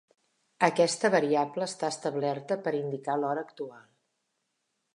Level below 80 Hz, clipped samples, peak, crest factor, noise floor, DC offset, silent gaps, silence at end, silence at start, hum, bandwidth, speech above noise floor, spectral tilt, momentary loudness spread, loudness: -84 dBFS; under 0.1%; -6 dBFS; 24 dB; -80 dBFS; under 0.1%; none; 1.15 s; 0.6 s; none; 11.5 kHz; 51 dB; -4.5 dB/octave; 10 LU; -29 LUFS